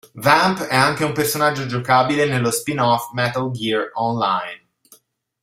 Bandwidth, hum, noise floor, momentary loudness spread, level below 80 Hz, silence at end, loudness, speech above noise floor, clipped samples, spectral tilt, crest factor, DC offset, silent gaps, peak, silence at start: 16 kHz; none; -53 dBFS; 7 LU; -56 dBFS; 0.85 s; -18 LUFS; 35 dB; under 0.1%; -4.5 dB/octave; 18 dB; under 0.1%; none; 0 dBFS; 0.15 s